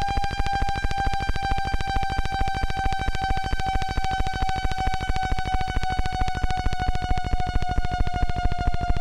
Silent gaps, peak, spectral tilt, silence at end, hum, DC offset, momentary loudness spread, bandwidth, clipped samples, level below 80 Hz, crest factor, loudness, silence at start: none; -8 dBFS; -5 dB/octave; 0 s; none; under 0.1%; 1 LU; 10.5 kHz; under 0.1%; -26 dBFS; 16 dB; -27 LUFS; 0 s